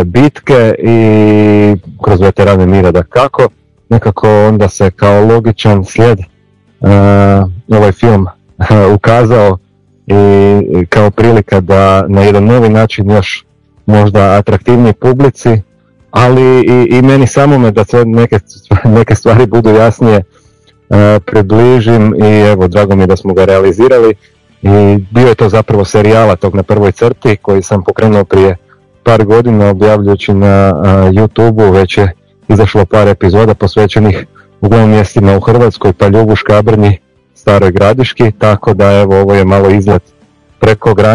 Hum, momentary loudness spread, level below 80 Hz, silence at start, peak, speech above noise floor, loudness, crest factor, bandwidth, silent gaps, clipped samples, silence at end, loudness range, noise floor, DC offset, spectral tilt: none; 5 LU; -34 dBFS; 0 s; 0 dBFS; 42 dB; -7 LUFS; 6 dB; 11 kHz; none; 10%; 0 s; 2 LU; -48 dBFS; 2%; -8 dB/octave